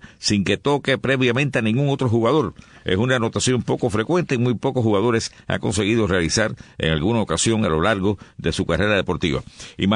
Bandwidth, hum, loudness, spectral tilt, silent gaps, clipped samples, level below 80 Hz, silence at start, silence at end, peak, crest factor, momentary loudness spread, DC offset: 11 kHz; none; -20 LUFS; -5 dB/octave; none; under 0.1%; -42 dBFS; 0.05 s; 0 s; -4 dBFS; 16 dB; 6 LU; under 0.1%